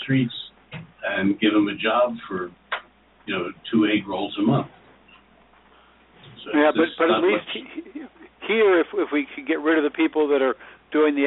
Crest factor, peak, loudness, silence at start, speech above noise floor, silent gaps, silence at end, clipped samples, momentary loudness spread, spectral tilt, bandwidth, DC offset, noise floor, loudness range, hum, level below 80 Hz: 16 dB; -6 dBFS; -22 LUFS; 0 s; 34 dB; none; 0 s; under 0.1%; 17 LU; -4 dB/octave; 4.1 kHz; under 0.1%; -55 dBFS; 4 LU; none; -64 dBFS